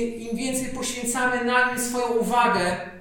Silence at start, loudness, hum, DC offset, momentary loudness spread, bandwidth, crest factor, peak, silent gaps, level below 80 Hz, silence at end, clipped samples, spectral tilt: 0 s; -23 LUFS; none; under 0.1%; 7 LU; 18 kHz; 16 dB; -8 dBFS; none; -48 dBFS; 0 s; under 0.1%; -3 dB/octave